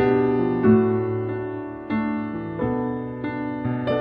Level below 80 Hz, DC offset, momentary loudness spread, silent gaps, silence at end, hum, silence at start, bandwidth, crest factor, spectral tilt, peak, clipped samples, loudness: -50 dBFS; under 0.1%; 11 LU; none; 0 s; none; 0 s; 5.2 kHz; 16 dB; -10.5 dB/octave; -6 dBFS; under 0.1%; -24 LUFS